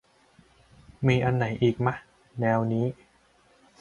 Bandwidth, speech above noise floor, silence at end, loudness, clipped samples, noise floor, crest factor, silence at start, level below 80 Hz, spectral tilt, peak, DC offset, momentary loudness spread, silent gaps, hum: 7 kHz; 37 dB; 0.85 s; -26 LUFS; under 0.1%; -62 dBFS; 20 dB; 1 s; -56 dBFS; -8 dB/octave; -8 dBFS; under 0.1%; 15 LU; none; none